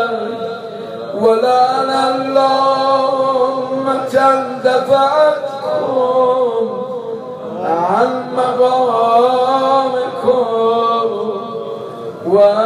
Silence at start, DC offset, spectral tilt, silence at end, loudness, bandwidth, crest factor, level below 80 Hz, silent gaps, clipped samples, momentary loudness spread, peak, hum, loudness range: 0 s; under 0.1%; -5.5 dB/octave; 0 s; -14 LUFS; 11.5 kHz; 12 dB; -64 dBFS; none; under 0.1%; 13 LU; -2 dBFS; none; 2 LU